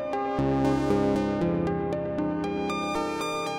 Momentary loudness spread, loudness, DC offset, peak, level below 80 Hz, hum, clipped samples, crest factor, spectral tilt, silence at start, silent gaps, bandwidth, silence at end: 5 LU; -27 LUFS; under 0.1%; -14 dBFS; -46 dBFS; none; under 0.1%; 14 dB; -6.5 dB/octave; 0 s; none; 15.5 kHz; 0 s